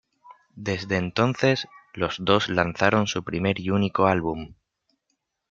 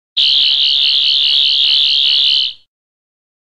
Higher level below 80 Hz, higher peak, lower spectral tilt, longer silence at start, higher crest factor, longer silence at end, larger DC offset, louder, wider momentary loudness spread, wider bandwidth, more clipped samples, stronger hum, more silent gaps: first, -56 dBFS vs -62 dBFS; about the same, -2 dBFS vs -2 dBFS; first, -5.5 dB/octave vs 2.5 dB/octave; about the same, 0.25 s vs 0.15 s; first, 24 dB vs 12 dB; about the same, 1 s vs 0.95 s; second, under 0.1% vs 0.7%; second, -24 LUFS vs -9 LUFS; first, 10 LU vs 2 LU; second, 7.6 kHz vs 10 kHz; neither; neither; neither